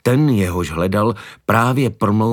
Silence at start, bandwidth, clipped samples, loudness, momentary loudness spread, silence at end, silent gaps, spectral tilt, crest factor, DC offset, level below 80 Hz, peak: 0.05 s; 18.5 kHz; under 0.1%; -17 LUFS; 5 LU; 0 s; none; -7 dB/octave; 16 dB; under 0.1%; -42 dBFS; 0 dBFS